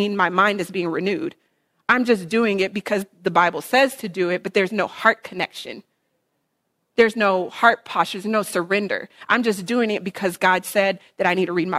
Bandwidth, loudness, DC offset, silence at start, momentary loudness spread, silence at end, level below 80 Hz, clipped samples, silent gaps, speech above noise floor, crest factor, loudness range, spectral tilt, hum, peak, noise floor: 16 kHz; -21 LUFS; under 0.1%; 0 s; 10 LU; 0 s; -66 dBFS; under 0.1%; none; 53 dB; 20 dB; 2 LU; -4.5 dB/octave; none; -2 dBFS; -73 dBFS